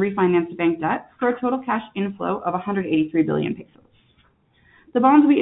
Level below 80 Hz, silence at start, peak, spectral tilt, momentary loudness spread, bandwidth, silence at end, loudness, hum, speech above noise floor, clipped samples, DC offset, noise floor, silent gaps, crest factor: -62 dBFS; 0 s; -4 dBFS; -11.5 dB/octave; 10 LU; 4 kHz; 0 s; -21 LUFS; none; 40 dB; under 0.1%; under 0.1%; -60 dBFS; none; 18 dB